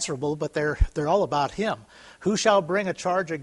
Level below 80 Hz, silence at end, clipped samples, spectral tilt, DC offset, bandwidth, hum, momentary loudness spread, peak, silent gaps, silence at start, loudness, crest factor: -34 dBFS; 0 s; under 0.1%; -4.5 dB/octave; under 0.1%; 11.5 kHz; none; 8 LU; -6 dBFS; none; 0 s; -25 LUFS; 18 dB